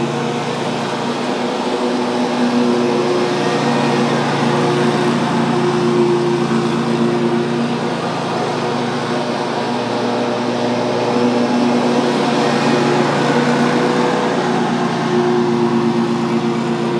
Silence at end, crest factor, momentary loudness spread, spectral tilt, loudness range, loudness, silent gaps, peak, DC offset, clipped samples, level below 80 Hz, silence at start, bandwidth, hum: 0 s; 14 dB; 5 LU; -5.5 dB/octave; 3 LU; -16 LUFS; none; -2 dBFS; under 0.1%; under 0.1%; -58 dBFS; 0 s; 11 kHz; none